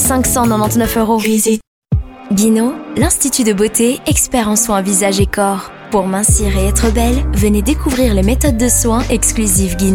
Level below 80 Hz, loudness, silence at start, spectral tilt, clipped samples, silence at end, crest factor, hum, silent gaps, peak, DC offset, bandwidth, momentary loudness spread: -22 dBFS; -13 LUFS; 0 s; -4.5 dB/octave; under 0.1%; 0 s; 12 dB; none; 1.67-1.82 s; 0 dBFS; under 0.1%; 19.5 kHz; 5 LU